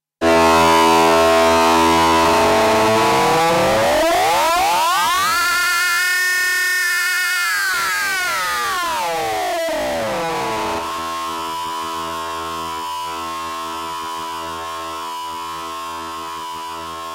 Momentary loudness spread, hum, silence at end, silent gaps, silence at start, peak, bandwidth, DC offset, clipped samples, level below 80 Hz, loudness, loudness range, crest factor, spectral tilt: 14 LU; none; 0 s; none; 0.2 s; -8 dBFS; 16 kHz; under 0.1%; under 0.1%; -44 dBFS; -17 LUFS; 12 LU; 10 dB; -2.5 dB/octave